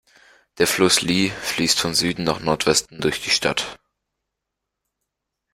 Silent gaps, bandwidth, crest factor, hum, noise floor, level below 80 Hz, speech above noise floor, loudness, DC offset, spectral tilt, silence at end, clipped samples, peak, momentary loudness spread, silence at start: none; 16 kHz; 20 dB; none; -82 dBFS; -52 dBFS; 61 dB; -19 LUFS; under 0.1%; -2.5 dB/octave; 1.8 s; under 0.1%; -2 dBFS; 7 LU; 0.55 s